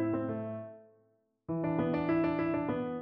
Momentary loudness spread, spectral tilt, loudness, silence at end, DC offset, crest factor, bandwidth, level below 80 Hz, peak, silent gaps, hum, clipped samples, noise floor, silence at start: 13 LU; -7.5 dB/octave; -33 LUFS; 0 s; under 0.1%; 14 dB; 5.2 kHz; -62 dBFS; -20 dBFS; none; none; under 0.1%; -72 dBFS; 0 s